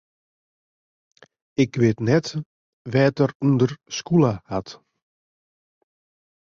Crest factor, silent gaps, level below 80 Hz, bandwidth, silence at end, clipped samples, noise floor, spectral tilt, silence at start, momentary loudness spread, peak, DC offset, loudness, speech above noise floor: 18 dB; 2.46-2.85 s, 3.35-3.40 s; -58 dBFS; 7.4 kHz; 1.75 s; under 0.1%; under -90 dBFS; -7 dB/octave; 1.6 s; 12 LU; -6 dBFS; under 0.1%; -22 LUFS; over 69 dB